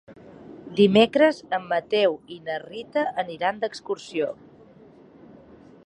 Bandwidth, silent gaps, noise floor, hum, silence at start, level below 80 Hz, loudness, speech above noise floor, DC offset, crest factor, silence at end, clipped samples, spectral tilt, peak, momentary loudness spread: 11 kHz; none; -50 dBFS; none; 0.1 s; -62 dBFS; -24 LUFS; 27 dB; under 0.1%; 20 dB; 1.5 s; under 0.1%; -6 dB/octave; -4 dBFS; 15 LU